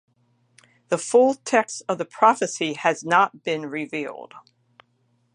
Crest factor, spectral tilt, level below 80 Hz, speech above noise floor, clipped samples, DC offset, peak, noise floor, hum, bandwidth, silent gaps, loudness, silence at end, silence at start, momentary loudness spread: 22 dB; -3.5 dB/octave; -78 dBFS; 45 dB; under 0.1%; under 0.1%; -2 dBFS; -67 dBFS; none; 11 kHz; none; -22 LUFS; 0.95 s; 0.9 s; 11 LU